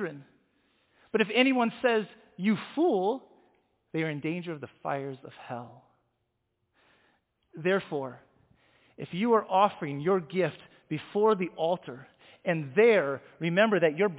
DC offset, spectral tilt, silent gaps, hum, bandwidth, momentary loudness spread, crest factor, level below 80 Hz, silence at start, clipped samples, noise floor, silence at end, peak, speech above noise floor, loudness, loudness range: under 0.1%; -9.5 dB/octave; none; none; 4 kHz; 17 LU; 20 dB; -76 dBFS; 0 s; under 0.1%; -79 dBFS; 0 s; -10 dBFS; 51 dB; -28 LUFS; 9 LU